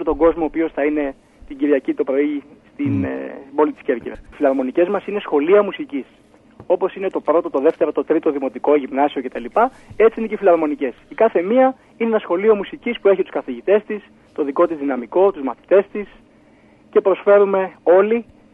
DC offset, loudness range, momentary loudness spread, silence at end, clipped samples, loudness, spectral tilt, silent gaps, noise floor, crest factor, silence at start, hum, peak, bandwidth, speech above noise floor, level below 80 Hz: under 0.1%; 3 LU; 11 LU; 0.3 s; under 0.1%; -18 LUFS; -8.5 dB/octave; none; -50 dBFS; 16 dB; 0 s; none; -2 dBFS; 3.9 kHz; 32 dB; -50 dBFS